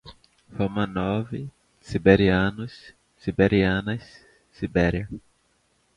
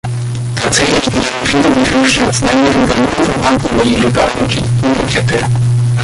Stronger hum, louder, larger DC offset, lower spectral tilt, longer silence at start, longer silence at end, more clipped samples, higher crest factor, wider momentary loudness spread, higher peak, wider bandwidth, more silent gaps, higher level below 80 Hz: neither; second, -24 LUFS vs -12 LUFS; neither; first, -8 dB/octave vs -5 dB/octave; about the same, 0.05 s vs 0.05 s; first, 0.75 s vs 0 s; neither; first, 22 dB vs 12 dB; first, 19 LU vs 4 LU; about the same, -2 dBFS vs 0 dBFS; second, 10 kHz vs 11.5 kHz; neither; second, -44 dBFS vs -30 dBFS